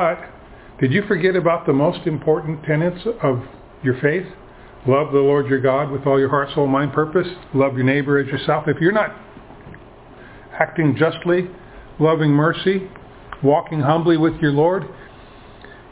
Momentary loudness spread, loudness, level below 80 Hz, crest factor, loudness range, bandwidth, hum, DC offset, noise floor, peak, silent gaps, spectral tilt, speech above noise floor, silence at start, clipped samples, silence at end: 9 LU; -19 LUFS; -48 dBFS; 20 dB; 3 LU; 4 kHz; none; under 0.1%; -42 dBFS; 0 dBFS; none; -11 dB/octave; 24 dB; 0 s; under 0.1%; 0.1 s